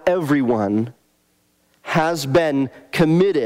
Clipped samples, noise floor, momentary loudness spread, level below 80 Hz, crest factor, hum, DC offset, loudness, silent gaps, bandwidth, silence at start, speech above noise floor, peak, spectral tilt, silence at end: under 0.1%; -63 dBFS; 8 LU; -52 dBFS; 16 dB; none; under 0.1%; -19 LUFS; none; 16 kHz; 0.05 s; 45 dB; -4 dBFS; -6.5 dB/octave; 0 s